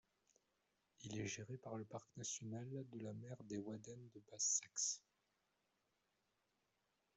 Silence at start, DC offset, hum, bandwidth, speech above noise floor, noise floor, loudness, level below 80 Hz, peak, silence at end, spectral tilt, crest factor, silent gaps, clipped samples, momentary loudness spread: 1 s; under 0.1%; none; 8.2 kHz; 38 dB; -86 dBFS; -46 LUFS; -84 dBFS; -28 dBFS; 2.15 s; -3 dB/octave; 24 dB; none; under 0.1%; 15 LU